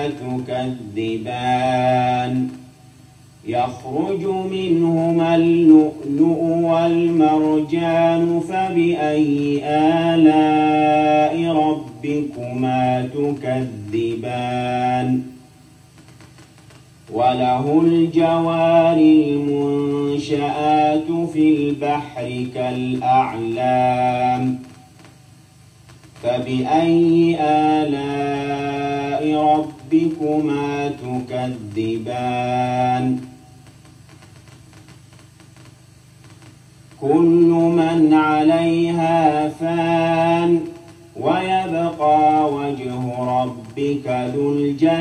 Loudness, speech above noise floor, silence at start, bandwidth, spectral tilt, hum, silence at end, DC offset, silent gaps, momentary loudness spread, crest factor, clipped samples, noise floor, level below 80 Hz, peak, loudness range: -18 LUFS; 30 dB; 0 s; 9.4 kHz; -7.5 dB/octave; none; 0 s; under 0.1%; none; 10 LU; 16 dB; under 0.1%; -47 dBFS; -54 dBFS; -2 dBFS; 7 LU